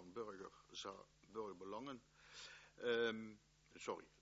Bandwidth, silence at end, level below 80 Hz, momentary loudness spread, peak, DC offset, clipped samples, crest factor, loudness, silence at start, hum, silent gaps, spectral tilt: 7.6 kHz; 0.15 s; -80 dBFS; 18 LU; -28 dBFS; under 0.1%; under 0.1%; 22 dB; -49 LUFS; 0 s; none; none; -2 dB/octave